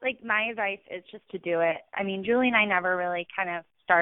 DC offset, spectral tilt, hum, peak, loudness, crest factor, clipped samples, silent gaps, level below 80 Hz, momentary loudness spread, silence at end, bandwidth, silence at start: under 0.1%; -9 dB/octave; none; -8 dBFS; -27 LUFS; 20 dB; under 0.1%; none; -70 dBFS; 14 LU; 0 s; 4 kHz; 0 s